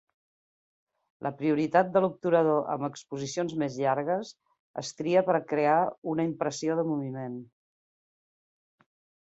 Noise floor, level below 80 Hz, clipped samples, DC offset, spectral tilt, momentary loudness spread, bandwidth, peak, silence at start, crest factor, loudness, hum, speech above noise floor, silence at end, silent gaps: under -90 dBFS; -74 dBFS; under 0.1%; under 0.1%; -6 dB/octave; 13 LU; 8.2 kHz; -8 dBFS; 1.2 s; 20 dB; -28 LUFS; none; over 62 dB; 1.85 s; 4.59-4.74 s, 5.98-6.02 s